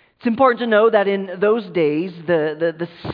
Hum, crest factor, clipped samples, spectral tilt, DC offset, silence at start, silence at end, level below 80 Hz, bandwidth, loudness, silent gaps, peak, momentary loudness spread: none; 16 dB; under 0.1%; -9.5 dB/octave; under 0.1%; 0.25 s; 0 s; -62 dBFS; 5.2 kHz; -18 LUFS; none; -2 dBFS; 9 LU